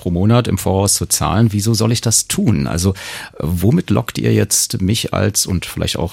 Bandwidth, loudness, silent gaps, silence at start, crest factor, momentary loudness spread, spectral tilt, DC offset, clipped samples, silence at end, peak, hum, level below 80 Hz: 16.5 kHz; -15 LUFS; none; 0 s; 14 dB; 6 LU; -4.5 dB/octave; under 0.1%; under 0.1%; 0 s; -2 dBFS; none; -36 dBFS